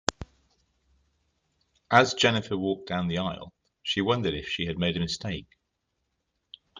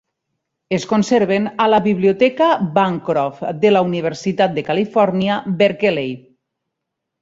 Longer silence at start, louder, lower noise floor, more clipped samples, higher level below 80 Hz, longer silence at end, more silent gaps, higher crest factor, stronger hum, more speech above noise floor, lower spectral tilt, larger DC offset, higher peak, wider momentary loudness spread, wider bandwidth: second, 0.1 s vs 0.7 s; second, -27 LUFS vs -17 LUFS; about the same, -79 dBFS vs -79 dBFS; neither; about the same, -56 dBFS vs -60 dBFS; second, 0 s vs 1 s; neither; first, 26 dB vs 16 dB; neither; second, 52 dB vs 63 dB; second, -4.5 dB/octave vs -6 dB/octave; neither; about the same, -4 dBFS vs -2 dBFS; first, 16 LU vs 7 LU; first, 9.6 kHz vs 7.8 kHz